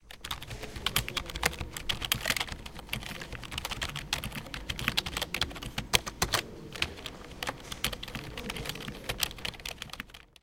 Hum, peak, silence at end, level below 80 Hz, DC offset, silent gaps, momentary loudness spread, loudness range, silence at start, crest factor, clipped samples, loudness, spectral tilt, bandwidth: none; -4 dBFS; 0.15 s; -46 dBFS; under 0.1%; none; 11 LU; 4 LU; 0 s; 32 dB; under 0.1%; -34 LUFS; -2 dB/octave; 17 kHz